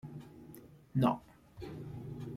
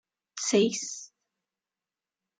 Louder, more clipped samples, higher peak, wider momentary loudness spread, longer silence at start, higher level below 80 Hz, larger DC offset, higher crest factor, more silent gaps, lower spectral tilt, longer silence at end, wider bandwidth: second, -37 LUFS vs -27 LUFS; neither; second, -16 dBFS vs -12 dBFS; first, 22 LU vs 17 LU; second, 0.05 s vs 0.35 s; first, -64 dBFS vs -78 dBFS; neither; about the same, 22 dB vs 20 dB; neither; first, -8.5 dB/octave vs -3 dB/octave; second, 0 s vs 1.35 s; first, 16 kHz vs 9.6 kHz